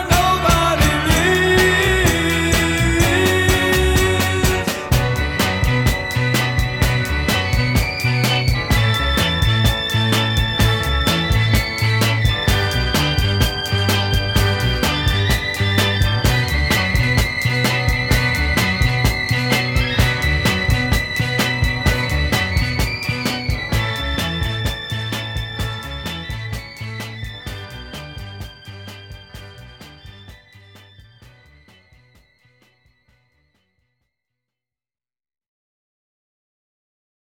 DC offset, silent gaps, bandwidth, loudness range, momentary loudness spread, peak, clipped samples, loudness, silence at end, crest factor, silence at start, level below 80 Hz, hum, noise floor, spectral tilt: under 0.1%; none; 18.5 kHz; 13 LU; 13 LU; -2 dBFS; under 0.1%; -17 LUFS; 6.95 s; 16 dB; 0 s; -26 dBFS; none; under -90 dBFS; -4.5 dB/octave